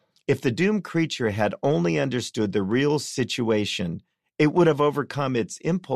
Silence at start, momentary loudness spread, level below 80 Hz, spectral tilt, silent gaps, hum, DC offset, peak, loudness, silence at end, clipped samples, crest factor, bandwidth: 0.3 s; 7 LU; -56 dBFS; -5.5 dB/octave; none; none; under 0.1%; -8 dBFS; -24 LUFS; 0 s; under 0.1%; 16 dB; 14 kHz